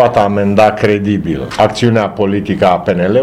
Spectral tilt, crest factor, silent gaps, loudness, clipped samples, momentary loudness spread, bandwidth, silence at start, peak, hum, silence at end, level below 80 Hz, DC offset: -7 dB/octave; 12 dB; none; -12 LUFS; 0.2%; 5 LU; 12.5 kHz; 0 s; 0 dBFS; none; 0 s; -40 dBFS; under 0.1%